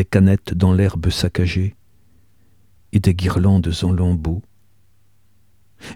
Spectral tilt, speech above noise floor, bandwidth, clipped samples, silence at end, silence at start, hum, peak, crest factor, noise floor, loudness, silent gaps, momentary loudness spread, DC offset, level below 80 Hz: -7 dB/octave; 44 dB; 13 kHz; under 0.1%; 0 s; 0 s; none; 0 dBFS; 18 dB; -60 dBFS; -18 LUFS; none; 9 LU; 0.3%; -34 dBFS